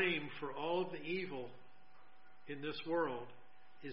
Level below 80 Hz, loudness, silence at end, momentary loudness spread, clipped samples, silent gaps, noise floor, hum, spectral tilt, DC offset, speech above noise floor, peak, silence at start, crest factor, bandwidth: -84 dBFS; -41 LUFS; 0 s; 15 LU; under 0.1%; none; -67 dBFS; none; -3 dB/octave; 0.3%; 26 dB; -22 dBFS; 0 s; 20 dB; 5.6 kHz